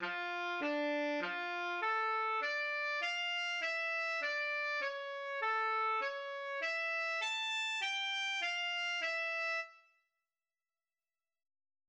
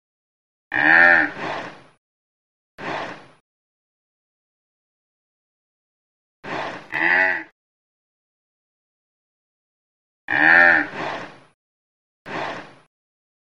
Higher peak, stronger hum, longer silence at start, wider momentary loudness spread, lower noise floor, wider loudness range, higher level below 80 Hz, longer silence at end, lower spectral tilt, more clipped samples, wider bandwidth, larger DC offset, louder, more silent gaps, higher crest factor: second, -26 dBFS vs 0 dBFS; neither; second, 0 s vs 0.7 s; second, 4 LU vs 21 LU; about the same, under -90 dBFS vs under -90 dBFS; second, 2 LU vs 18 LU; second, -84 dBFS vs -66 dBFS; first, 2.1 s vs 0.85 s; second, -1 dB/octave vs -4.5 dB/octave; neither; first, 10.5 kHz vs 8.4 kHz; second, under 0.1% vs 0.3%; second, -36 LUFS vs -17 LUFS; second, none vs 1.98-2.78 s, 3.40-6.43 s, 7.52-10.28 s, 11.54-12.25 s; second, 12 dB vs 24 dB